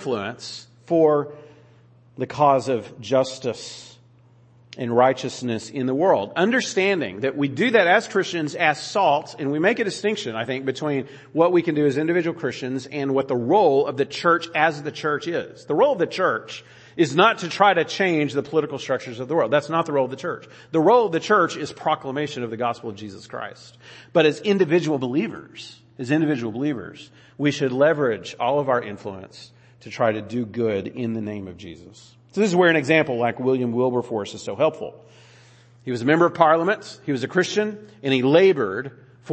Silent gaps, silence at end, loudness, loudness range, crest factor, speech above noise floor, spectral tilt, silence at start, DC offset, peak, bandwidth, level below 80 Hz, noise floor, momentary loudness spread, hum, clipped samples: none; 0 s; -21 LUFS; 4 LU; 22 dB; 32 dB; -5.5 dB/octave; 0 s; under 0.1%; 0 dBFS; 8.8 kHz; -68 dBFS; -53 dBFS; 16 LU; none; under 0.1%